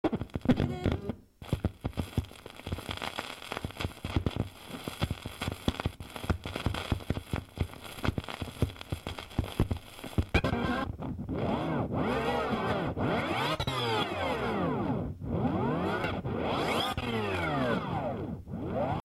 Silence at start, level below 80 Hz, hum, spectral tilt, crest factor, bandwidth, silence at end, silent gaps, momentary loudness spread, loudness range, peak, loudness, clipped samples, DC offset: 0.05 s; -44 dBFS; none; -6 dB/octave; 20 dB; 16 kHz; 0.05 s; none; 9 LU; 6 LU; -12 dBFS; -33 LUFS; under 0.1%; under 0.1%